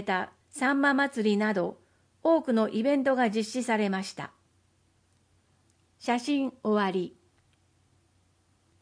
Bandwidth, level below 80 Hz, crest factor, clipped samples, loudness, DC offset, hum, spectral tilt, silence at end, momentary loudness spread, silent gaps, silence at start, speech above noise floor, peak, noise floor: 10.5 kHz; -76 dBFS; 16 dB; under 0.1%; -28 LUFS; under 0.1%; none; -5 dB/octave; 1.7 s; 12 LU; none; 0 s; 41 dB; -12 dBFS; -68 dBFS